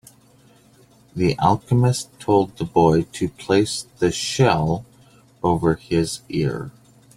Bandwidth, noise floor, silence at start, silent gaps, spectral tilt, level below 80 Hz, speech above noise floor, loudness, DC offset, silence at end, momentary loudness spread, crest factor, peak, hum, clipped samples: 15 kHz; -53 dBFS; 1.15 s; none; -6 dB/octave; -48 dBFS; 33 dB; -20 LUFS; under 0.1%; 0.45 s; 9 LU; 18 dB; -2 dBFS; none; under 0.1%